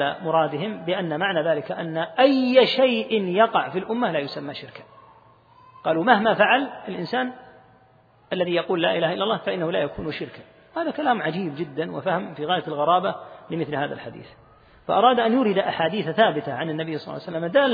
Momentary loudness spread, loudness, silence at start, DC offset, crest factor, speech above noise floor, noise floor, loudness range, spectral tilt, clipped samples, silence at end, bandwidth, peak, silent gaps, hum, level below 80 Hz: 13 LU; -23 LUFS; 0 s; under 0.1%; 22 dB; 34 dB; -56 dBFS; 5 LU; -8 dB/octave; under 0.1%; 0 s; 5 kHz; -2 dBFS; none; none; -62 dBFS